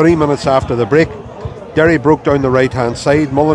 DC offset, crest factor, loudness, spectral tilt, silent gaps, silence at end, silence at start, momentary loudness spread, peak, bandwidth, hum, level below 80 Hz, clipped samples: under 0.1%; 12 dB; -13 LUFS; -7 dB/octave; none; 0 s; 0 s; 8 LU; 0 dBFS; 10.5 kHz; none; -36 dBFS; 0.2%